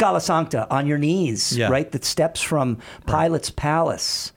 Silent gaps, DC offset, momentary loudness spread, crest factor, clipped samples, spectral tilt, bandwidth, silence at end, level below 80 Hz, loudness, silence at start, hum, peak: none; under 0.1%; 3 LU; 14 dB; under 0.1%; -4.5 dB/octave; 19 kHz; 0.05 s; -44 dBFS; -21 LUFS; 0 s; none; -6 dBFS